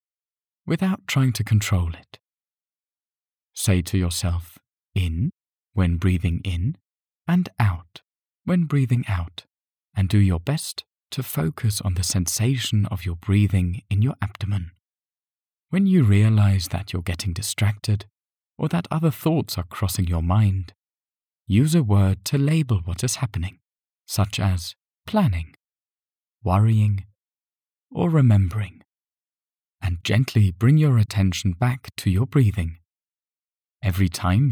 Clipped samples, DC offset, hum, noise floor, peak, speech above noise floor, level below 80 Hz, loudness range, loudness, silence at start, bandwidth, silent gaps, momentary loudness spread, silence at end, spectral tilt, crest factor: under 0.1%; under 0.1%; none; under -90 dBFS; -6 dBFS; over 69 dB; -42 dBFS; 4 LU; -22 LUFS; 0.65 s; 18 kHz; 9.84-9.88 s, 33.57-33.61 s; 12 LU; 0 s; -6 dB/octave; 16 dB